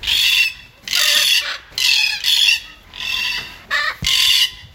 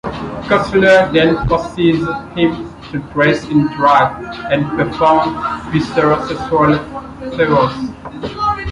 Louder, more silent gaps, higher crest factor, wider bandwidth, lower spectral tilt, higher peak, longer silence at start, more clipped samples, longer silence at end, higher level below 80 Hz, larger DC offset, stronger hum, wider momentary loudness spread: about the same, -14 LUFS vs -14 LUFS; neither; about the same, 18 dB vs 14 dB; first, 17 kHz vs 11 kHz; second, 1.5 dB/octave vs -7 dB/octave; about the same, 0 dBFS vs 0 dBFS; about the same, 0 s vs 0.05 s; neither; about the same, 0.1 s vs 0 s; second, -44 dBFS vs -36 dBFS; neither; neither; second, 10 LU vs 14 LU